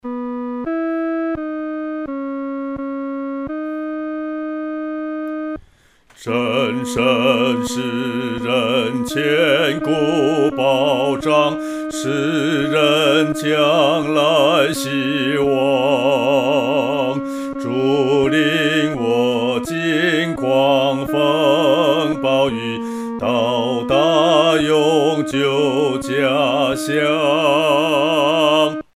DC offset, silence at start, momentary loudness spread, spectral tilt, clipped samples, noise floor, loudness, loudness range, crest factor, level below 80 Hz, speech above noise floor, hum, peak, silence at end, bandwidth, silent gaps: under 0.1%; 0.05 s; 11 LU; -5 dB/octave; under 0.1%; -52 dBFS; -17 LUFS; 8 LU; 16 dB; -52 dBFS; 36 dB; none; -2 dBFS; 0.15 s; 15.5 kHz; none